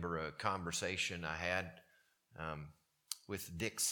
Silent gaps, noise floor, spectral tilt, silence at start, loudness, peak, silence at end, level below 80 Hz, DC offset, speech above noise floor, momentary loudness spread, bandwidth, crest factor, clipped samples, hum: none; -73 dBFS; -2.5 dB/octave; 0 s; -41 LUFS; -16 dBFS; 0 s; -64 dBFS; under 0.1%; 32 dB; 12 LU; 19 kHz; 26 dB; under 0.1%; none